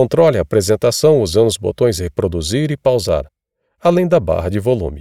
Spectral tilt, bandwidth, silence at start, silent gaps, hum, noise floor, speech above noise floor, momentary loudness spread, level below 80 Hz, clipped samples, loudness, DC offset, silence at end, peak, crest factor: -5.5 dB/octave; 15.5 kHz; 0 s; none; none; -59 dBFS; 45 dB; 7 LU; -38 dBFS; under 0.1%; -15 LUFS; 0.3%; 0 s; 0 dBFS; 14 dB